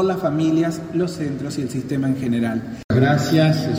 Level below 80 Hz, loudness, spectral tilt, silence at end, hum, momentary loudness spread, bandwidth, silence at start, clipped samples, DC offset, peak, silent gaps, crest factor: -50 dBFS; -20 LUFS; -7 dB/octave; 0 s; none; 9 LU; 16 kHz; 0 s; under 0.1%; under 0.1%; -2 dBFS; 2.84-2.89 s; 16 dB